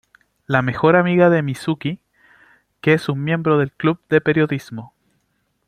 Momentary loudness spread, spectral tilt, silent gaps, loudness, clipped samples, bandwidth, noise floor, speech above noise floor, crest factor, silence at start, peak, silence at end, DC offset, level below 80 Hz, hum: 13 LU; -7.5 dB/octave; none; -18 LUFS; under 0.1%; 13.5 kHz; -68 dBFS; 51 dB; 18 dB; 0.5 s; -2 dBFS; 0.8 s; under 0.1%; -56 dBFS; none